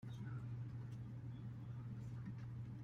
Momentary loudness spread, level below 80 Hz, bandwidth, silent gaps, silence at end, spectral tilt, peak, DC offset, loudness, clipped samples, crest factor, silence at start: 2 LU; -66 dBFS; 7 kHz; none; 0 s; -8.5 dB/octave; -40 dBFS; under 0.1%; -50 LUFS; under 0.1%; 10 dB; 0 s